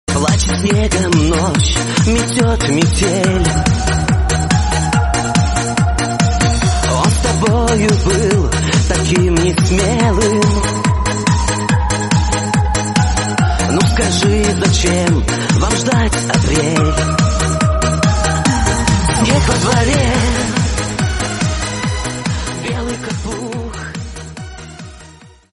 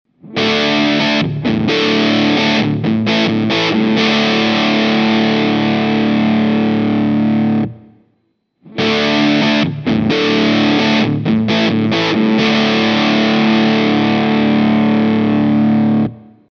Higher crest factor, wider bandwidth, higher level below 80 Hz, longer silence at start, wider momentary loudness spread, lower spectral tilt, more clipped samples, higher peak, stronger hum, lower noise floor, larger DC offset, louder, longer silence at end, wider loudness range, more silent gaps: about the same, 14 dB vs 12 dB; first, 11.5 kHz vs 6.8 kHz; first, -22 dBFS vs -48 dBFS; second, 0.1 s vs 0.25 s; first, 7 LU vs 3 LU; second, -4.5 dB/octave vs -6 dB/octave; neither; about the same, 0 dBFS vs -2 dBFS; neither; second, -40 dBFS vs -63 dBFS; neither; about the same, -14 LUFS vs -13 LUFS; about the same, 0.25 s vs 0.35 s; about the same, 5 LU vs 3 LU; neither